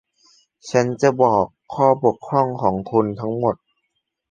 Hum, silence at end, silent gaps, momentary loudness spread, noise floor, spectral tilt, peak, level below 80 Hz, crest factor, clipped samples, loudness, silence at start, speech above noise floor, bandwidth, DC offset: none; 0.75 s; none; 7 LU; -75 dBFS; -7 dB/octave; -2 dBFS; -54 dBFS; 18 dB; under 0.1%; -19 LUFS; 0.65 s; 56 dB; 9.2 kHz; under 0.1%